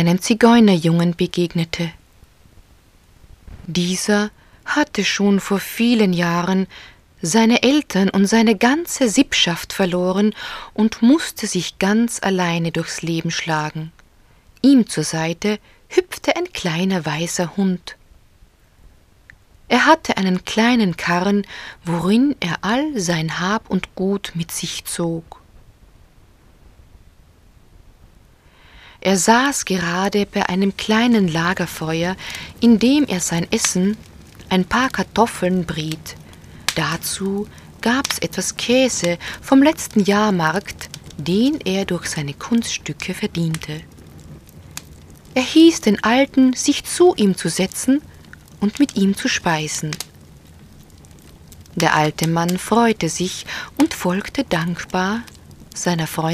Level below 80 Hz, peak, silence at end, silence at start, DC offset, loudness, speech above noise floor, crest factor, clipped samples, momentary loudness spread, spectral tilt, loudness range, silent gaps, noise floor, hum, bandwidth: -48 dBFS; 0 dBFS; 0 s; 0 s; under 0.1%; -18 LUFS; 33 dB; 18 dB; under 0.1%; 12 LU; -4.5 dB/octave; 7 LU; none; -51 dBFS; none; 15.5 kHz